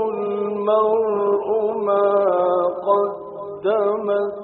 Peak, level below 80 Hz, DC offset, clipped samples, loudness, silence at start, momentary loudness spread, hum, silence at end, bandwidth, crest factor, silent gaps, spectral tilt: -4 dBFS; -66 dBFS; under 0.1%; under 0.1%; -20 LUFS; 0 s; 6 LU; none; 0 s; 4.1 kHz; 14 dB; none; -5.5 dB/octave